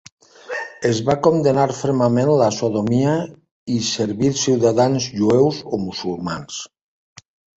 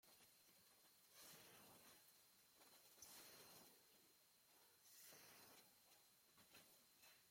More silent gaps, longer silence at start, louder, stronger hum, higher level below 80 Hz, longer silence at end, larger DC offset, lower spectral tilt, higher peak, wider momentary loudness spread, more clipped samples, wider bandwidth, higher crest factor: first, 3.51-3.66 s vs none; first, 0.5 s vs 0.05 s; first, -19 LUFS vs -66 LUFS; neither; first, -52 dBFS vs under -90 dBFS; first, 0.9 s vs 0 s; neither; first, -5.5 dB/octave vs -1 dB/octave; first, -2 dBFS vs -48 dBFS; first, 13 LU vs 7 LU; neither; second, 8.2 kHz vs 16.5 kHz; about the same, 18 dB vs 22 dB